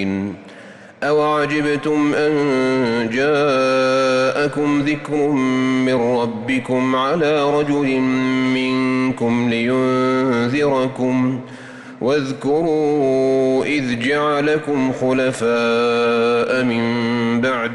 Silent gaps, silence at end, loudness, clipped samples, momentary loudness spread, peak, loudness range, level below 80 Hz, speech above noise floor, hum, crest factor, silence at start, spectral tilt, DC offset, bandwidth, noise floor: none; 0 s; -17 LUFS; under 0.1%; 4 LU; -8 dBFS; 2 LU; -54 dBFS; 22 dB; none; 10 dB; 0 s; -6 dB/octave; under 0.1%; 11.5 kHz; -40 dBFS